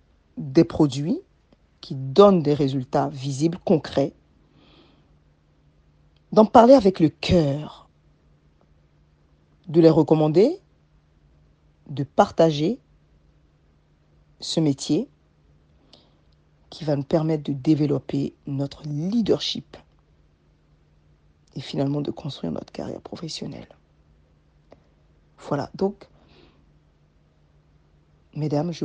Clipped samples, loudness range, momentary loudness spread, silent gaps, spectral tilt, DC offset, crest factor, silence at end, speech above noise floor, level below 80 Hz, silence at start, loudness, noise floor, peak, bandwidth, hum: under 0.1%; 14 LU; 19 LU; none; -7 dB/octave; under 0.1%; 24 dB; 0 s; 39 dB; -54 dBFS; 0.35 s; -22 LUFS; -60 dBFS; 0 dBFS; 9.4 kHz; none